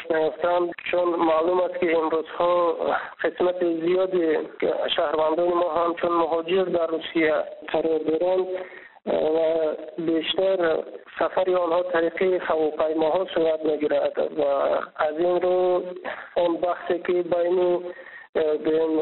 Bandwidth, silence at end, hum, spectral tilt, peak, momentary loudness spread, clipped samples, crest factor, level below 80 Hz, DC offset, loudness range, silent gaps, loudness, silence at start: 4.2 kHz; 0 s; none; -3 dB/octave; -6 dBFS; 6 LU; under 0.1%; 16 dB; -62 dBFS; under 0.1%; 2 LU; 18.29-18.33 s; -23 LUFS; 0 s